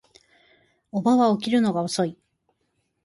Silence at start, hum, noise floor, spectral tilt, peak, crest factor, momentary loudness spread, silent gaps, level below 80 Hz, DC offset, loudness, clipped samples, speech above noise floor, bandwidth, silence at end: 0.95 s; none; -73 dBFS; -5.5 dB/octave; -10 dBFS; 16 dB; 9 LU; none; -68 dBFS; under 0.1%; -23 LUFS; under 0.1%; 52 dB; 11.5 kHz; 0.9 s